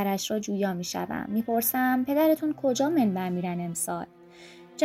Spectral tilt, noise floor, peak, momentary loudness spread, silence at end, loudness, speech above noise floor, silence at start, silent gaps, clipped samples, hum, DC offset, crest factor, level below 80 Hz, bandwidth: -5 dB/octave; -49 dBFS; -12 dBFS; 8 LU; 0 s; -27 LUFS; 23 dB; 0 s; none; under 0.1%; none; under 0.1%; 16 dB; -66 dBFS; 16.5 kHz